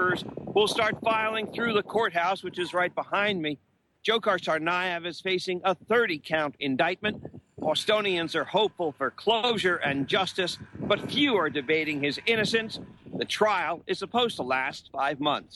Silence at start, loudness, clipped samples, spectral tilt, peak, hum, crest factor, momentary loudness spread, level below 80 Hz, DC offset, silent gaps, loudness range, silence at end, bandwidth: 0 s; -27 LUFS; under 0.1%; -4 dB/octave; -10 dBFS; none; 18 dB; 7 LU; -64 dBFS; under 0.1%; none; 2 LU; 0 s; 12.5 kHz